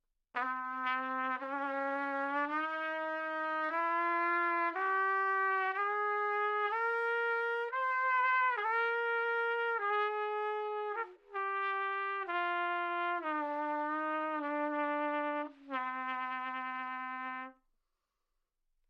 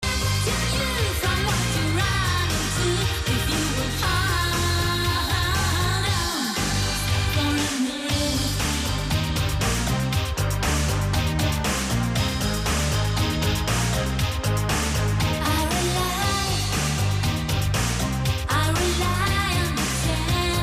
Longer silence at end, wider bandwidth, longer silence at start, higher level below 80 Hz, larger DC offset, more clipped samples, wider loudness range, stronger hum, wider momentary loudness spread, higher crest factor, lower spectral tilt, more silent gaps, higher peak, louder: first, 1.4 s vs 0 s; second, 8.2 kHz vs 16 kHz; first, 0.35 s vs 0 s; second, -84 dBFS vs -32 dBFS; neither; neither; first, 5 LU vs 1 LU; neither; first, 8 LU vs 2 LU; about the same, 14 dB vs 12 dB; about the same, -3 dB/octave vs -4 dB/octave; neither; second, -20 dBFS vs -12 dBFS; second, -34 LUFS vs -23 LUFS